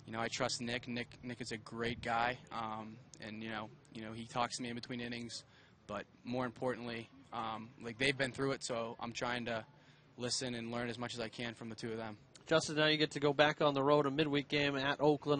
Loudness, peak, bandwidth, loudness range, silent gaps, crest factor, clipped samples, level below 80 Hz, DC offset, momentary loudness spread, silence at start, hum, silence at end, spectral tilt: -37 LUFS; -14 dBFS; 9.6 kHz; 10 LU; none; 24 dB; under 0.1%; -68 dBFS; under 0.1%; 15 LU; 0.05 s; none; 0 s; -4 dB/octave